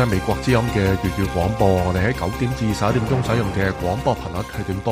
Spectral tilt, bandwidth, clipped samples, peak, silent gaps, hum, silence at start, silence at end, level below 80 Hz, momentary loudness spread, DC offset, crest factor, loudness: -6.5 dB/octave; 15.5 kHz; under 0.1%; -4 dBFS; none; none; 0 s; 0 s; -34 dBFS; 6 LU; under 0.1%; 16 dB; -21 LUFS